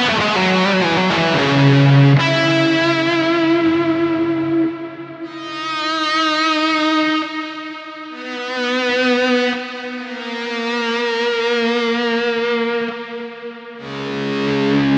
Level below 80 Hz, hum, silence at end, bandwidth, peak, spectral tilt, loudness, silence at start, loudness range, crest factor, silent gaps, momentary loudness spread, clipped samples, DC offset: -56 dBFS; none; 0 s; 8.4 kHz; -2 dBFS; -6 dB/octave; -16 LUFS; 0 s; 6 LU; 16 dB; none; 15 LU; under 0.1%; under 0.1%